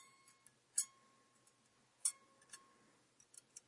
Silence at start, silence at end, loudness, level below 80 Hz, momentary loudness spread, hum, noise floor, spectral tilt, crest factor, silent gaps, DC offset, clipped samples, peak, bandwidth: 0.75 s; 0.1 s; -42 LUFS; under -90 dBFS; 21 LU; none; -75 dBFS; 2 dB/octave; 30 dB; none; under 0.1%; under 0.1%; -22 dBFS; 12 kHz